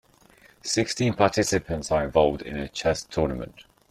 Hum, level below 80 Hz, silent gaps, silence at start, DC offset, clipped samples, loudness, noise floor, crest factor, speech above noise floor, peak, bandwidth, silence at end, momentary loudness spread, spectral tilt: none; -46 dBFS; none; 0.65 s; under 0.1%; under 0.1%; -25 LUFS; -56 dBFS; 20 dB; 31 dB; -4 dBFS; 14.5 kHz; 0.3 s; 11 LU; -4.5 dB/octave